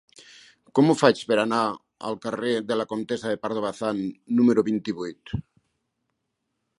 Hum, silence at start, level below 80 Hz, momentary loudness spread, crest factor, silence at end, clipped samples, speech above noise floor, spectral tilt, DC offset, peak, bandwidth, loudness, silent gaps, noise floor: none; 0.75 s; -56 dBFS; 13 LU; 24 dB; 1.4 s; under 0.1%; 55 dB; -6 dB/octave; under 0.1%; -2 dBFS; 11 kHz; -25 LUFS; none; -79 dBFS